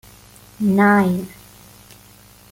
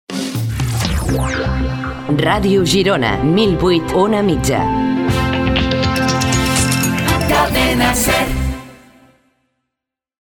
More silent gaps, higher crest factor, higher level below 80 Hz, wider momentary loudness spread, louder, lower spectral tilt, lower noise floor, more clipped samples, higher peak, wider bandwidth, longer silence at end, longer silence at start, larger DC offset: neither; about the same, 16 dB vs 14 dB; second, -54 dBFS vs -28 dBFS; first, 13 LU vs 7 LU; about the same, -17 LUFS vs -15 LUFS; first, -7.5 dB/octave vs -4.5 dB/octave; second, -47 dBFS vs -82 dBFS; neither; about the same, -4 dBFS vs -2 dBFS; about the same, 16.5 kHz vs 18 kHz; second, 1.25 s vs 1.45 s; first, 0.6 s vs 0.1 s; neither